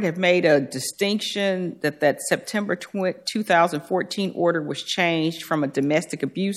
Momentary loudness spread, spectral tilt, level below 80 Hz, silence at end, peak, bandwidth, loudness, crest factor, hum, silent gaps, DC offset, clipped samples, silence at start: 7 LU; -4.5 dB/octave; -74 dBFS; 0 s; -4 dBFS; 15 kHz; -23 LUFS; 18 dB; none; none; under 0.1%; under 0.1%; 0 s